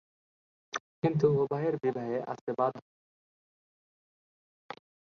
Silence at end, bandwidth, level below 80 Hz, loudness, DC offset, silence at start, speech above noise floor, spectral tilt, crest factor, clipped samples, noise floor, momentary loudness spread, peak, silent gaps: 0.4 s; 6.8 kHz; -72 dBFS; -31 LUFS; under 0.1%; 0.75 s; over 60 dB; -7.5 dB/octave; 20 dB; under 0.1%; under -90 dBFS; 21 LU; -14 dBFS; 0.80-1.02 s, 2.41-2.47 s, 2.82-4.69 s